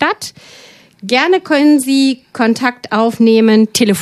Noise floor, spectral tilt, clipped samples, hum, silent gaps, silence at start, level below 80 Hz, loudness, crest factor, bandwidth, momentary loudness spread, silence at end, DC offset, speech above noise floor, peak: -41 dBFS; -4 dB/octave; under 0.1%; none; none; 0 s; -58 dBFS; -12 LUFS; 12 dB; 14 kHz; 7 LU; 0 s; under 0.1%; 30 dB; 0 dBFS